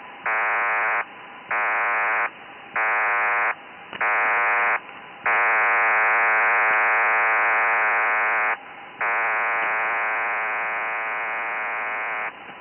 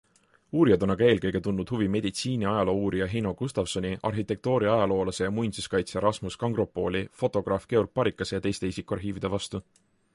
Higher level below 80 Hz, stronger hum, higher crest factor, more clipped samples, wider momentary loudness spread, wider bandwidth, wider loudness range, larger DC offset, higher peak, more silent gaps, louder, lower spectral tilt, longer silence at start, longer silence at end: second, -74 dBFS vs -50 dBFS; neither; second, 12 dB vs 18 dB; neither; about the same, 10 LU vs 8 LU; second, 3.3 kHz vs 11.5 kHz; about the same, 5 LU vs 3 LU; neither; about the same, -12 dBFS vs -10 dBFS; neither; first, -21 LUFS vs -27 LUFS; about the same, -5.5 dB/octave vs -6 dB/octave; second, 0 s vs 0.55 s; second, 0 s vs 0.55 s